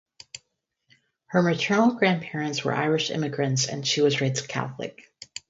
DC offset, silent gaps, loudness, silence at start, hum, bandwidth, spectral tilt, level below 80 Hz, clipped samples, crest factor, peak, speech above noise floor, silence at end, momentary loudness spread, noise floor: under 0.1%; none; -24 LUFS; 0.35 s; none; 8 kHz; -4.5 dB/octave; -66 dBFS; under 0.1%; 20 dB; -6 dBFS; 51 dB; 0.5 s; 18 LU; -76 dBFS